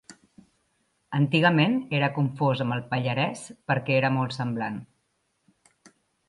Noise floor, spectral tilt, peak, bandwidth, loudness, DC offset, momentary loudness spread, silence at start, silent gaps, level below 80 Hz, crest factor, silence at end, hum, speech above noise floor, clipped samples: -73 dBFS; -6.5 dB/octave; -6 dBFS; 11.5 kHz; -25 LUFS; under 0.1%; 11 LU; 0.1 s; none; -68 dBFS; 20 dB; 1.45 s; none; 49 dB; under 0.1%